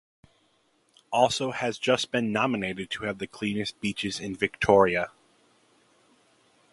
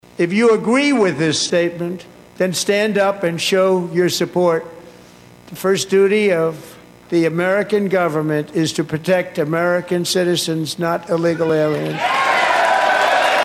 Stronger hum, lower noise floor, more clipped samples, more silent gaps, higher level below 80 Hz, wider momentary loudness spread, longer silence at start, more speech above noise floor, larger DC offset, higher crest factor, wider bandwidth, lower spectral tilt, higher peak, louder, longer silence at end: second, none vs 60 Hz at -45 dBFS; first, -68 dBFS vs -43 dBFS; neither; neither; about the same, -58 dBFS vs -60 dBFS; first, 11 LU vs 7 LU; first, 1.1 s vs 0.2 s; first, 41 dB vs 26 dB; neither; first, 24 dB vs 14 dB; second, 11.5 kHz vs 16 kHz; about the same, -4.5 dB/octave vs -4.5 dB/octave; second, -6 dBFS vs -2 dBFS; second, -27 LUFS vs -17 LUFS; first, 1.65 s vs 0 s